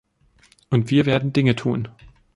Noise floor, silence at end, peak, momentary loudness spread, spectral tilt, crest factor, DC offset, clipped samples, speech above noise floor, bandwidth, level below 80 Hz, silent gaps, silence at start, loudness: -57 dBFS; 0.3 s; -4 dBFS; 9 LU; -7.5 dB/octave; 18 dB; under 0.1%; under 0.1%; 38 dB; 11 kHz; -52 dBFS; none; 0.7 s; -20 LUFS